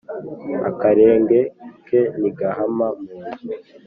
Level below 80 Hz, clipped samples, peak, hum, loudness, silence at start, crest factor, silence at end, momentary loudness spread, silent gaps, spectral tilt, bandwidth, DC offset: -60 dBFS; under 0.1%; -2 dBFS; none; -18 LUFS; 0.1 s; 16 dB; 0.25 s; 18 LU; none; -8 dB/octave; 4.5 kHz; under 0.1%